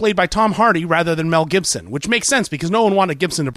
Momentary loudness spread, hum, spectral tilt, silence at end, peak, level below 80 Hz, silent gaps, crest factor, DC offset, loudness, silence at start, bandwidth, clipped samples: 5 LU; none; -4 dB/octave; 0 s; -4 dBFS; -44 dBFS; none; 14 dB; under 0.1%; -16 LUFS; 0 s; 15.5 kHz; under 0.1%